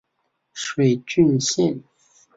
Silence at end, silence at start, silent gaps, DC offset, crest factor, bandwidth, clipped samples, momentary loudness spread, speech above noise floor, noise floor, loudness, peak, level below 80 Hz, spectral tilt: 0.6 s; 0.55 s; none; under 0.1%; 16 dB; 7.8 kHz; under 0.1%; 15 LU; 54 dB; -73 dBFS; -20 LUFS; -6 dBFS; -60 dBFS; -5 dB/octave